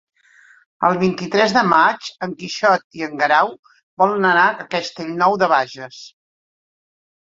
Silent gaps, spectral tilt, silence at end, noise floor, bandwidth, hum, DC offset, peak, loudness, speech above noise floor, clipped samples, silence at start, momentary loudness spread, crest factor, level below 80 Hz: 2.84-2.90 s, 3.59-3.63 s, 3.83-3.97 s; -4.5 dB/octave; 1.15 s; -51 dBFS; 7.8 kHz; none; under 0.1%; -2 dBFS; -17 LUFS; 33 dB; under 0.1%; 0.8 s; 14 LU; 18 dB; -64 dBFS